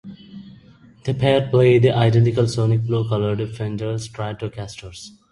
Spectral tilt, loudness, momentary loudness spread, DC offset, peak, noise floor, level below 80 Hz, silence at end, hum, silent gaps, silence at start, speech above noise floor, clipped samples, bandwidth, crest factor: -7 dB/octave; -19 LUFS; 21 LU; under 0.1%; -2 dBFS; -48 dBFS; -48 dBFS; 0.25 s; none; none; 0.05 s; 29 dB; under 0.1%; 11.5 kHz; 18 dB